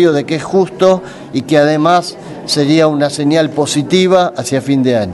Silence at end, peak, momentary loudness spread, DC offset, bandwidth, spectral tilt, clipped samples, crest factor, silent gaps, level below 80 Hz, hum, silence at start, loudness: 0 s; 0 dBFS; 7 LU; under 0.1%; 12 kHz; -5.5 dB/octave; under 0.1%; 12 dB; none; -52 dBFS; none; 0 s; -12 LUFS